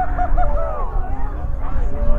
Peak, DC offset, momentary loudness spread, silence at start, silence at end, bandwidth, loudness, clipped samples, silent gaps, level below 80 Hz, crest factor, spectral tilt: -2 dBFS; under 0.1%; 6 LU; 0 s; 0 s; 2.7 kHz; -25 LUFS; under 0.1%; none; -18 dBFS; 14 dB; -9.5 dB/octave